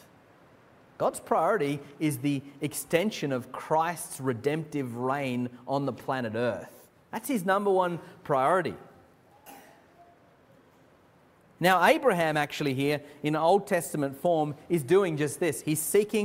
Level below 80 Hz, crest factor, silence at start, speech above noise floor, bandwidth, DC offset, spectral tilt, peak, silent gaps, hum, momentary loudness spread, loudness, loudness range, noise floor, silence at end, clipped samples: -68 dBFS; 20 dB; 1 s; 33 dB; 16 kHz; under 0.1%; -5 dB/octave; -8 dBFS; none; none; 9 LU; -28 LUFS; 6 LU; -60 dBFS; 0 s; under 0.1%